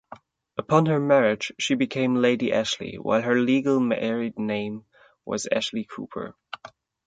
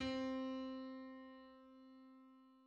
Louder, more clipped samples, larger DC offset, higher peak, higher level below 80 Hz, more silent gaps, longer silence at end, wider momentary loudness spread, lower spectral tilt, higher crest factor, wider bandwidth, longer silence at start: first, -24 LUFS vs -47 LUFS; neither; neither; first, -4 dBFS vs -32 dBFS; first, -64 dBFS vs -74 dBFS; neither; first, 0.4 s vs 0 s; second, 16 LU vs 20 LU; about the same, -5 dB/octave vs -5.5 dB/octave; first, 22 dB vs 16 dB; first, 9.2 kHz vs 8 kHz; about the same, 0.1 s vs 0 s